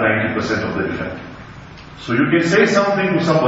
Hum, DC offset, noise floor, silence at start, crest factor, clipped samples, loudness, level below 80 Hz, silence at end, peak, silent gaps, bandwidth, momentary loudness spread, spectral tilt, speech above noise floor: none; under 0.1%; -37 dBFS; 0 s; 16 dB; under 0.1%; -17 LUFS; -46 dBFS; 0 s; 0 dBFS; none; 8 kHz; 23 LU; -6 dB/octave; 20 dB